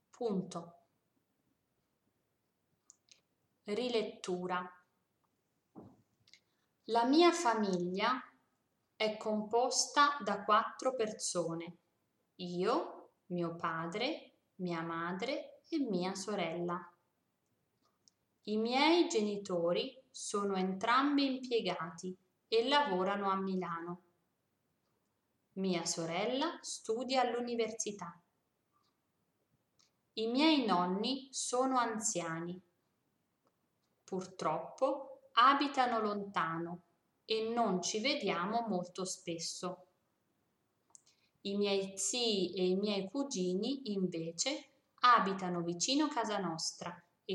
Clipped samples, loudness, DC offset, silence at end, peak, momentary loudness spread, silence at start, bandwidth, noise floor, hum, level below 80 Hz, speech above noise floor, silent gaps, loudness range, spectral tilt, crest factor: under 0.1%; -35 LUFS; under 0.1%; 0 s; -14 dBFS; 14 LU; 0.2 s; 12.5 kHz; -82 dBFS; none; -88 dBFS; 48 dB; none; 8 LU; -3.5 dB/octave; 22 dB